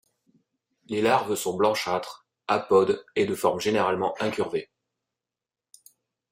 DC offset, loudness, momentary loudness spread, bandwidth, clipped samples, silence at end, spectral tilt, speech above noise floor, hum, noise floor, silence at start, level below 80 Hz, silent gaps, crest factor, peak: under 0.1%; -25 LUFS; 9 LU; 16 kHz; under 0.1%; 1.65 s; -4.5 dB/octave; 65 dB; none; -90 dBFS; 0.9 s; -68 dBFS; none; 20 dB; -8 dBFS